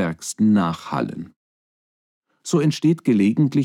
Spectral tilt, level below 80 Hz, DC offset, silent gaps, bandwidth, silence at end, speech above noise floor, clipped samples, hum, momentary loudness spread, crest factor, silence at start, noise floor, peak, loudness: -6.5 dB/octave; -62 dBFS; under 0.1%; 1.36-2.22 s; 14 kHz; 0 s; over 71 dB; under 0.1%; none; 15 LU; 14 dB; 0 s; under -90 dBFS; -8 dBFS; -20 LUFS